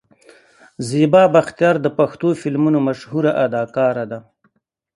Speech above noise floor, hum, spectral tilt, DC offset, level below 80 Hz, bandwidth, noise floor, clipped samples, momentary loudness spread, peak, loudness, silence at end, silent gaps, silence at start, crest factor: 49 dB; none; -7 dB/octave; under 0.1%; -62 dBFS; 11.5 kHz; -65 dBFS; under 0.1%; 12 LU; 0 dBFS; -17 LUFS; 0.75 s; none; 0.8 s; 18 dB